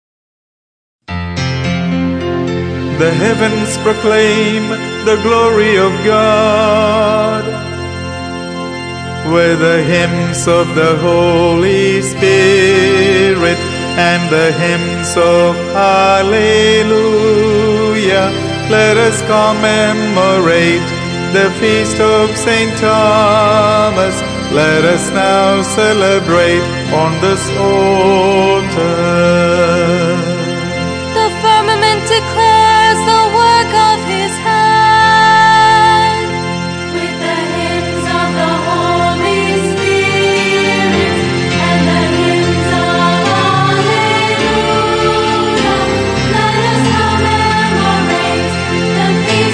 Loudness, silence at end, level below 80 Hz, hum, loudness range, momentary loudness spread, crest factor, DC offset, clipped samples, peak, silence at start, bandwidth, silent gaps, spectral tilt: -11 LUFS; 0 s; -38 dBFS; none; 4 LU; 8 LU; 10 dB; under 0.1%; under 0.1%; 0 dBFS; 1.1 s; 10 kHz; none; -4.5 dB/octave